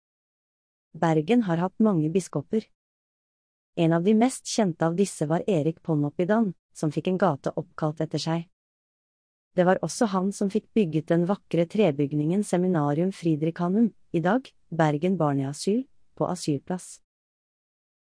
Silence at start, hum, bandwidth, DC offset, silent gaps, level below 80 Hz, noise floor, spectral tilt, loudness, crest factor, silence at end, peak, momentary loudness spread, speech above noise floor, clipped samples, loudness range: 0.95 s; none; 10.5 kHz; under 0.1%; 2.75-3.73 s, 6.59-6.69 s, 8.53-9.51 s; -68 dBFS; under -90 dBFS; -6.5 dB/octave; -26 LUFS; 18 dB; 1.15 s; -8 dBFS; 8 LU; over 65 dB; under 0.1%; 3 LU